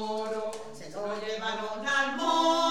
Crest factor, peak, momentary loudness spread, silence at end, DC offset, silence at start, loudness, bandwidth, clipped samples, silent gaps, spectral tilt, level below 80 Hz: 16 dB; -12 dBFS; 13 LU; 0 s; 0.5%; 0 s; -29 LUFS; 14 kHz; under 0.1%; none; -2.5 dB/octave; -68 dBFS